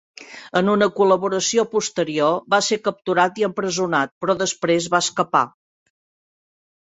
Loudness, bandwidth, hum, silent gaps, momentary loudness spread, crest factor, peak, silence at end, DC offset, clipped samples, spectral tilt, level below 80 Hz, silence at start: -20 LUFS; 8.4 kHz; none; 4.11-4.21 s; 5 LU; 18 dB; -2 dBFS; 1.4 s; under 0.1%; under 0.1%; -3.5 dB/octave; -64 dBFS; 0.2 s